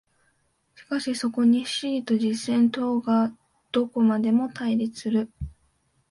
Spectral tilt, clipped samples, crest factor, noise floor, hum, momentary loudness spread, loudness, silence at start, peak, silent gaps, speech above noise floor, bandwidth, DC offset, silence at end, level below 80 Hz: -5.5 dB/octave; under 0.1%; 14 dB; -69 dBFS; none; 8 LU; -24 LUFS; 0.8 s; -12 dBFS; none; 45 dB; 11.5 kHz; under 0.1%; 0.6 s; -52 dBFS